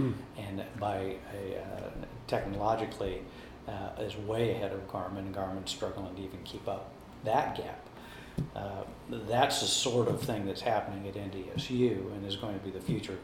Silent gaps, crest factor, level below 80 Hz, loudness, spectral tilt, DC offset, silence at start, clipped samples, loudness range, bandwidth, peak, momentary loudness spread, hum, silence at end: none; 22 dB; -54 dBFS; -35 LUFS; -4.5 dB/octave; under 0.1%; 0 s; under 0.1%; 6 LU; 16 kHz; -12 dBFS; 13 LU; none; 0 s